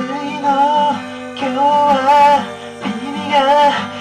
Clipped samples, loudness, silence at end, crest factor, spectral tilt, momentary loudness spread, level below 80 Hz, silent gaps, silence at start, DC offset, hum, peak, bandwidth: under 0.1%; -14 LUFS; 0 s; 10 dB; -4.5 dB/octave; 13 LU; -56 dBFS; none; 0 s; under 0.1%; none; -4 dBFS; 11.5 kHz